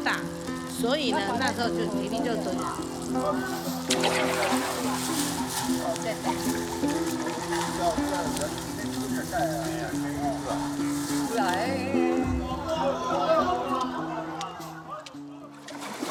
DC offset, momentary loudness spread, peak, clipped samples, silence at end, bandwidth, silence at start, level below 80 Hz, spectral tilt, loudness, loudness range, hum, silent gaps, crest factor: under 0.1%; 9 LU; -8 dBFS; under 0.1%; 0 s; 20 kHz; 0 s; -50 dBFS; -4 dB/octave; -28 LUFS; 2 LU; none; none; 20 dB